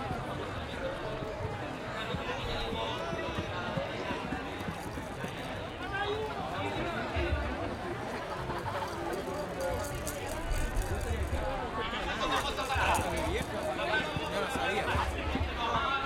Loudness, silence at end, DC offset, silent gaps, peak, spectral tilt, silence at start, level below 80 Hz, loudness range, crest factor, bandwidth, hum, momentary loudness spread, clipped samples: -34 LUFS; 0 s; under 0.1%; none; -16 dBFS; -4.5 dB/octave; 0 s; -42 dBFS; 5 LU; 18 dB; 16.5 kHz; none; 7 LU; under 0.1%